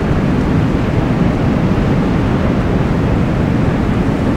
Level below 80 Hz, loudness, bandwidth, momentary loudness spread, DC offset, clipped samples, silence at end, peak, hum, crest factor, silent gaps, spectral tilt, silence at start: -22 dBFS; -14 LUFS; 11 kHz; 1 LU; under 0.1%; under 0.1%; 0 s; -2 dBFS; none; 12 dB; none; -8.5 dB/octave; 0 s